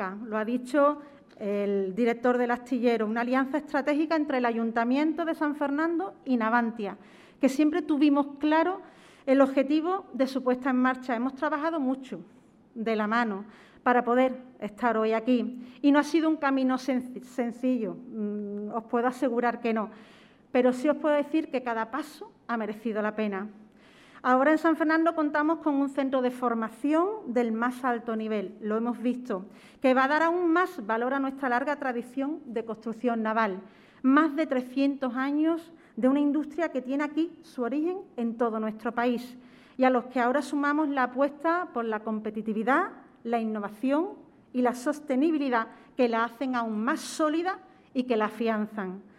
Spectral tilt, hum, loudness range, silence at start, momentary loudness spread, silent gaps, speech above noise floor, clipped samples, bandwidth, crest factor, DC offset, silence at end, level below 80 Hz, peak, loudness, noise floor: -5.5 dB/octave; none; 3 LU; 0 s; 10 LU; none; 28 dB; under 0.1%; 13 kHz; 18 dB; under 0.1%; 0.15 s; -74 dBFS; -8 dBFS; -28 LUFS; -55 dBFS